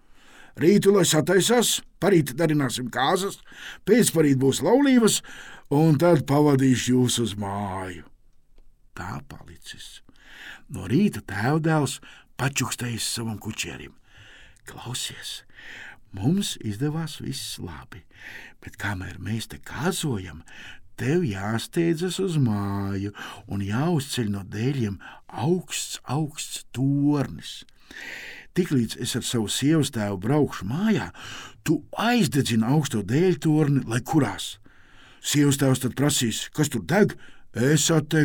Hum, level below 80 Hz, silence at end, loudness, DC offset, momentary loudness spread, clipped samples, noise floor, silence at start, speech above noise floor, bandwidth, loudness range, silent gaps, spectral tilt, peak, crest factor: none; -54 dBFS; 0 s; -24 LUFS; under 0.1%; 20 LU; under 0.1%; -51 dBFS; 0.4 s; 28 dB; 18 kHz; 10 LU; none; -5 dB/octave; -6 dBFS; 18 dB